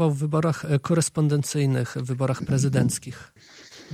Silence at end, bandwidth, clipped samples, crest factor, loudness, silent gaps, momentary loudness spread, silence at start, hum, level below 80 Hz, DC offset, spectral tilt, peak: 0 s; 15 kHz; under 0.1%; 16 dB; -24 LUFS; none; 9 LU; 0 s; none; -56 dBFS; under 0.1%; -6 dB/octave; -8 dBFS